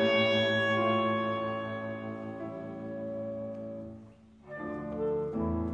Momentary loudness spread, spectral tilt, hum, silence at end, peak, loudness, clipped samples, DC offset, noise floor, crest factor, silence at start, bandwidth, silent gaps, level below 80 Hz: 15 LU; -6.5 dB/octave; none; 0 s; -16 dBFS; -32 LUFS; under 0.1%; under 0.1%; -54 dBFS; 16 dB; 0 s; 8 kHz; none; -54 dBFS